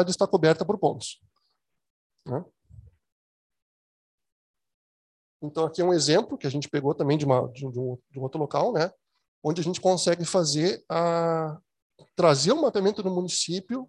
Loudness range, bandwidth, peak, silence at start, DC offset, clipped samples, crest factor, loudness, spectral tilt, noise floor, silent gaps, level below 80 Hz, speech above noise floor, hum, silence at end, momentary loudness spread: 19 LU; 11.5 kHz; -6 dBFS; 0 s; under 0.1%; under 0.1%; 20 dB; -25 LUFS; -5 dB/octave; -77 dBFS; 1.90-2.10 s, 3.12-3.50 s, 3.62-4.18 s, 4.32-4.54 s, 4.74-5.40 s, 9.28-9.42 s, 11.82-11.90 s; -66 dBFS; 52 dB; none; 0.05 s; 13 LU